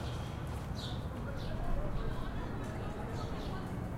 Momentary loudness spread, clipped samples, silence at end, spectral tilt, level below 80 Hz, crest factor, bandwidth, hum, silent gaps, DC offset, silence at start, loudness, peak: 2 LU; under 0.1%; 0 s; -6.5 dB/octave; -42 dBFS; 14 dB; 16 kHz; none; none; under 0.1%; 0 s; -40 LUFS; -22 dBFS